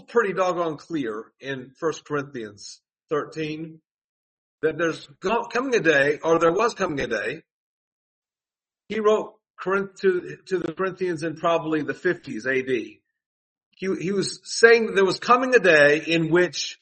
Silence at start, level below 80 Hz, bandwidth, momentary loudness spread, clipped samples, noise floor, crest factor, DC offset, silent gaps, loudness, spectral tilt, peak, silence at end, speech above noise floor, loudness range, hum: 0.1 s; -64 dBFS; 8.8 kHz; 17 LU; under 0.1%; under -90 dBFS; 24 dB; under 0.1%; 3.91-4.58 s, 7.51-8.22 s, 9.50-9.54 s, 13.26-13.56 s, 13.66-13.71 s; -22 LUFS; -4.5 dB/octave; 0 dBFS; 0.05 s; over 67 dB; 11 LU; none